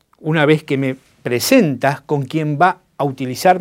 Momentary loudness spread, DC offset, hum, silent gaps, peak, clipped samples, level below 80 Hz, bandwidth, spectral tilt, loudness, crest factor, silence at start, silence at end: 9 LU; under 0.1%; none; none; 0 dBFS; under 0.1%; -60 dBFS; 16.5 kHz; -5.5 dB/octave; -17 LUFS; 16 dB; 0.25 s; 0 s